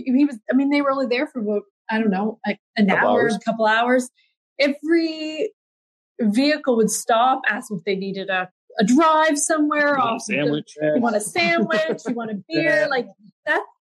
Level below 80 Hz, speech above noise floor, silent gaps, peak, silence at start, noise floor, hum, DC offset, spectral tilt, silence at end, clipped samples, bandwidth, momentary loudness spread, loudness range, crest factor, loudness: -74 dBFS; over 70 dB; 1.70-1.85 s, 2.59-2.74 s, 4.37-4.56 s, 5.53-6.15 s, 8.51-8.68 s, 13.32-13.43 s; -6 dBFS; 0 s; under -90 dBFS; none; under 0.1%; -4 dB/octave; 0.15 s; under 0.1%; 12.5 kHz; 9 LU; 2 LU; 14 dB; -20 LUFS